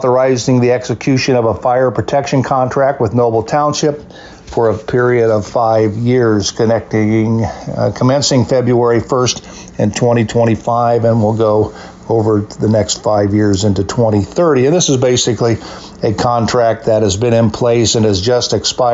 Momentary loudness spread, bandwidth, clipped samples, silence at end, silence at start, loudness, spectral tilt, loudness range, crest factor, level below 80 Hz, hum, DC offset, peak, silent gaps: 5 LU; 8 kHz; under 0.1%; 0 s; 0 s; -13 LUFS; -5.5 dB/octave; 1 LU; 10 dB; -42 dBFS; none; under 0.1%; -2 dBFS; none